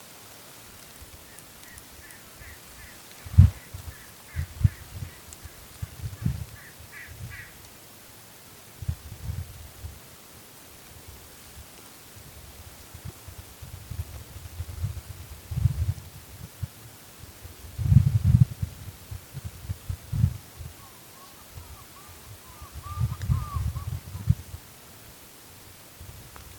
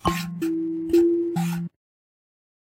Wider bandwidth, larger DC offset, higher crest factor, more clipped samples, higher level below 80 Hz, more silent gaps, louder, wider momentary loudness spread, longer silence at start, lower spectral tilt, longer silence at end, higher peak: first, 19 kHz vs 16.5 kHz; neither; first, 30 dB vs 18 dB; neither; first, -38 dBFS vs -48 dBFS; neither; second, -29 LUFS vs -24 LUFS; first, 20 LU vs 10 LU; about the same, 0 s vs 0.05 s; about the same, -6 dB/octave vs -6.5 dB/octave; second, 0 s vs 1 s; first, -2 dBFS vs -8 dBFS